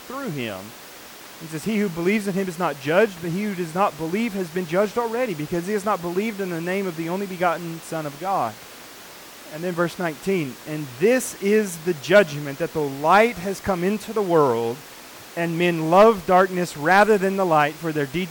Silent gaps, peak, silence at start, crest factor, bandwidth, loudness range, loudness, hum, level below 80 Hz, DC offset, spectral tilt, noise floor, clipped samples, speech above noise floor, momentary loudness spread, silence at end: none; -6 dBFS; 0 s; 16 dB; 19 kHz; 8 LU; -22 LUFS; none; -58 dBFS; under 0.1%; -5.5 dB/octave; -42 dBFS; under 0.1%; 20 dB; 17 LU; 0 s